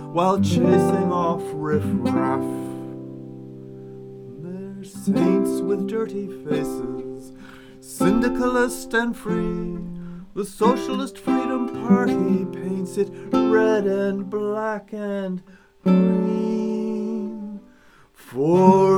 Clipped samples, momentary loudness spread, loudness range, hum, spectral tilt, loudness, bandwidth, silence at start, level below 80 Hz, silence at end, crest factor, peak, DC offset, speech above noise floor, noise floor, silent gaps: under 0.1%; 19 LU; 5 LU; none; -7 dB/octave; -22 LUFS; 17 kHz; 0 s; -50 dBFS; 0 s; 20 dB; -2 dBFS; under 0.1%; 31 dB; -52 dBFS; none